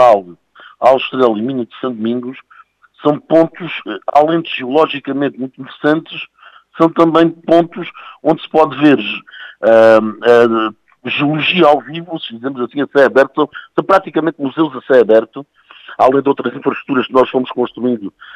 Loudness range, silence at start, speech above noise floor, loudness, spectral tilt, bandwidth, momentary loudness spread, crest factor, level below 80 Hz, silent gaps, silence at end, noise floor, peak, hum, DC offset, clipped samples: 4 LU; 0 s; 31 dB; -13 LUFS; -7 dB/octave; 9.2 kHz; 14 LU; 14 dB; -58 dBFS; none; 0.05 s; -44 dBFS; 0 dBFS; none; under 0.1%; under 0.1%